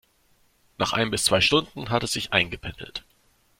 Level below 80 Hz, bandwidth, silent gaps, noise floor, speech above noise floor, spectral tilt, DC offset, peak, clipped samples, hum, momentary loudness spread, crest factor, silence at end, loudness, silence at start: -50 dBFS; 16.5 kHz; none; -63 dBFS; 39 dB; -3 dB/octave; under 0.1%; -4 dBFS; under 0.1%; none; 17 LU; 22 dB; 0.6 s; -23 LUFS; 0.8 s